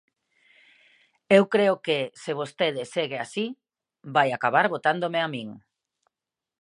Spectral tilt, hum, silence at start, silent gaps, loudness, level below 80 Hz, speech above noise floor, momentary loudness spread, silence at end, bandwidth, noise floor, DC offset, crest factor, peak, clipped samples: -5 dB/octave; none; 1.3 s; none; -24 LUFS; -78 dBFS; 65 dB; 11 LU; 1.05 s; 11.5 kHz; -89 dBFS; under 0.1%; 24 dB; -2 dBFS; under 0.1%